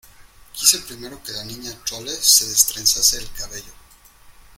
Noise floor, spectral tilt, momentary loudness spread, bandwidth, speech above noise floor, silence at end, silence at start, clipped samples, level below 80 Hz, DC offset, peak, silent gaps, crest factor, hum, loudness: -48 dBFS; 1 dB/octave; 20 LU; 17 kHz; 26 dB; 0.25 s; 0.2 s; under 0.1%; -46 dBFS; under 0.1%; 0 dBFS; none; 22 dB; none; -16 LUFS